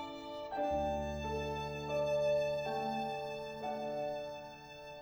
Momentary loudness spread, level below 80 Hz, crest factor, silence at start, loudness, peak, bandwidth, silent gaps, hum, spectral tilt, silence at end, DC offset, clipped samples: 12 LU; -56 dBFS; 14 dB; 0 s; -38 LUFS; -24 dBFS; over 20 kHz; none; none; -5.5 dB/octave; 0 s; under 0.1%; under 0.1%